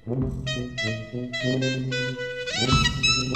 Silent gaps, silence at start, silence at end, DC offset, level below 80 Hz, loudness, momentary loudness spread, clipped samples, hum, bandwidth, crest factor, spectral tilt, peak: none; 0.05 s; 0 s; 0.2%; -40 dBFS; -25 LUFS; 10 LU; under 0.1%; none; 10 kHz; 20 dB; -4 dB/octave; -6 dBFS